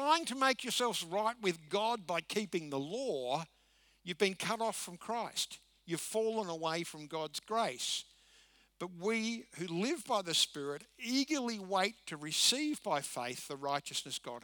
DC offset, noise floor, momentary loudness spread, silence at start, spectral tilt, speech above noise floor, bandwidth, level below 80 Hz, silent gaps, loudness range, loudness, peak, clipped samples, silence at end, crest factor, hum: under 0.1%; -68 dBFS; 11 LU; 0 s; -2.5 dB/octave; 31 dB; over 20 kHz; -78 dBFS; none; 5 LU; -36 LUFS; -14 dBFS; under 0.1%; 0.05 s; 22 dB; none